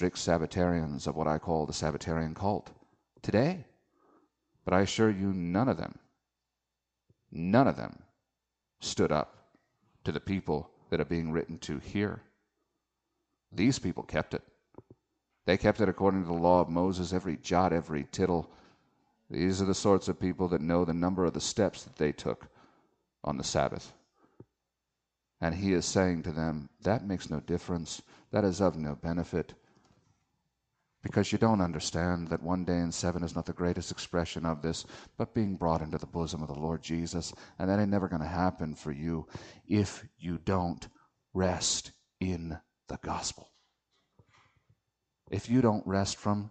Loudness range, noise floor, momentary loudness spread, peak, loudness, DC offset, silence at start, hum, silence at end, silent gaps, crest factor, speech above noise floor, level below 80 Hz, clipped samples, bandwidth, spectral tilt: 5 LU; -87 dBFS; 12 LU; -10 dBFS; -31 LUFS; under 0.1%; 0 s; none; 0 s; none; 22 dB; 56 dB; -54 dBFS; under 0.1%; 9.2 kHz; -5.5 dB/octave